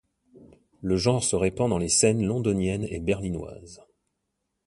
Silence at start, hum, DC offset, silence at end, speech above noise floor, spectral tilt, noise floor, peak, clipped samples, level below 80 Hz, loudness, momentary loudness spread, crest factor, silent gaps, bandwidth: 0.4 s; none; under 0.1%; 0.9 s; 54 dB; -4.5 dB/octave; -79 dBFS; -6 dBFS; under 0.1%; -46 dBFS; -25 LUFS; 15 LU; 20 dB; none; 11.5 kHz